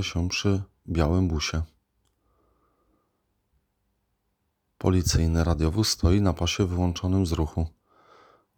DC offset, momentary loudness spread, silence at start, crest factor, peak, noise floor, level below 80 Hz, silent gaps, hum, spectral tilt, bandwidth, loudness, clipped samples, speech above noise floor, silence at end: under 0.1%; 8 LU; 0 s; 18 dB; -8 dBFS; -76 dBFS; -38 dBFS; none; none; -5.5 dB/octave; 17.5 kHz; -25 LUFS; under 0.1%; 52 dB; 0.9 s